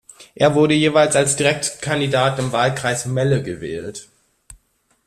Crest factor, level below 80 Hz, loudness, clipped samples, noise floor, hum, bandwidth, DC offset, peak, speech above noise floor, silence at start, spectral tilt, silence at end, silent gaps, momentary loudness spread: 16 dB; -52 dBFS; -18 LUFS; under 0.1%; -63 dBFS; none; 13.5 kHz; under 0.1%; -2 dBFS; 45 dB; 0.2 s; -4.5 dB/octave; 0.55 s; none; 13 LU